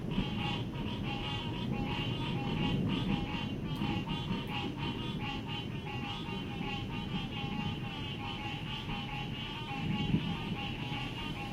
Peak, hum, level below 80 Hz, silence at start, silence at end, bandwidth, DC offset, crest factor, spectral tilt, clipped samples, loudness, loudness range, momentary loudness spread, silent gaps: -18 dBFS; none; -48 dBFS; 0 s; 0 s; 15.5 kHz; under 0.1%; 18 dB; -6.5 dB/octave; under 0.1%; -36 LUFS; 3 LU; 5 LU; none